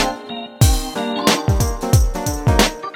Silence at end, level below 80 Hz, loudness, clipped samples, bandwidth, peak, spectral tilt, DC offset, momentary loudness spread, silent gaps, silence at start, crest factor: 0 s; -22 dBFS; -17 LUFS; under 0.1%; over 20 kHz; 0 dBFS; -4.5 dB/octave; under 0.1%; 6 LU; none; 0 s; 18 dB